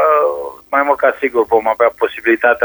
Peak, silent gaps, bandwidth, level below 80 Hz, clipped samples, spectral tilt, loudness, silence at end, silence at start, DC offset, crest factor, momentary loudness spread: 0 dBFS; none; over 20 kHz; -54 dBFS; under 0.1%; -5.5 dB/octave; -14 LUFS; 0 s; 0 s; under 0.1%; 14 dB; 5 LU